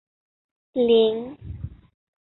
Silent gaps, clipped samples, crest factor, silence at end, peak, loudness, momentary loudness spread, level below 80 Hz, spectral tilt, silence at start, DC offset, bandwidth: none; under 0.1%; 18 dB; 0.5 s; -8 dBFS; -21 LUFS; 20 LU; -48 dBFS; -10.5 dB/octave; 0.75 s; under 0.1%; 4.2 kHz